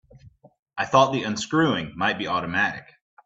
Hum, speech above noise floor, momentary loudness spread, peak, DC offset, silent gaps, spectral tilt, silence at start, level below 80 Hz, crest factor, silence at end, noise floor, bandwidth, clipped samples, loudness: none; 28 dB; 10 LU; -4 dBFS; under 0.1%; 0.59-0.66 s; -4.5 dB/octave; 0.25 s; -58 dBFS; 20 dB; 0.45 s; -51 dBFS; 8 kHz; under 0.1%; -23 LUFS